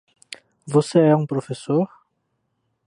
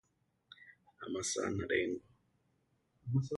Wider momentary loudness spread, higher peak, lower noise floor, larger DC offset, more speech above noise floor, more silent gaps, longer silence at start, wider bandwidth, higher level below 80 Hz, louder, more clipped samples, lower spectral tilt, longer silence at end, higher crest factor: about the same, 23 LU vs 22 LU; first, -4 dBFS vs -20 dBFS; second, -73 dBFS vs -77 dBFS; neither; first, 54 dB vs 41 dB; neither; second, 0.3 s vs 0.6 s; about the same, 11.5 kHz vs 11.5 kHz; second, -70 dBFS vs -64 dBFS; first, -20 LUFS vs -37 LUFS; neither; first, -7 dB/octave vs -4.5 dB/octave; first, 1 s vs 0 s; about the same, 18 dB vs 20 dB